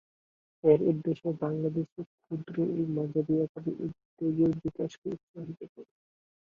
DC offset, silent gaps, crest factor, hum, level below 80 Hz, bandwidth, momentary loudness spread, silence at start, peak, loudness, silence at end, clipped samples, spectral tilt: under 0.1%; 1.92-1.96 s, 2.06-2.18 s, 3.49-3.55 s, 4.05-4.17 s, 4.98-5.02 s, 5.23-5.34 s, 5.69-5.76 s; 22 dB; none; -66 dBFS; 7 kHz; 17 LU; 0.65 s; -10 dBFS; -31 LUFS; 0.65 s; under 0.1%; -10 dB/octave